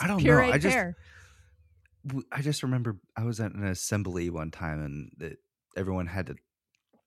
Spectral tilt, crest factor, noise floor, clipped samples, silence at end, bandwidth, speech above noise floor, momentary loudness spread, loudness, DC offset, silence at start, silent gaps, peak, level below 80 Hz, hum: -5.5 dB/octave; 22 dB; -73 dBFS; under 0.1%; 0.7 s; 14 kHz; 44 dB; 21 LU; -29 LUFS; under 0.1%; 0 s; none; -8 dBFS; -50 dBFS; none